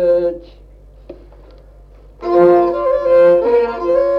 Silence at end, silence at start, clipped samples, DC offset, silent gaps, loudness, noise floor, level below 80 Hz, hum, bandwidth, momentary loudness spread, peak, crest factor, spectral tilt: 0 s; 0 s; under 0.1%; under 0.1%; none; -13 LUFS; -41 dBFS; -42 dBFS; 50 Hz at -40 dBFS; 5.6 kHz; 11 LU; -2 dBFS; 14 dB; -8.5 dB/octave